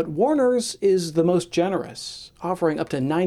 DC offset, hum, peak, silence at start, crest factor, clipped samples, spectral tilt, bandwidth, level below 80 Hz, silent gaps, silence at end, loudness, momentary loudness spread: under 0.1%; none; -8 dBFS; 0 s; 14 dB; under 0.1%; -5.5 dB/octave; 13.5 kHz; -58 dBFS; none; 0 s; -22 LUFS; 13 LU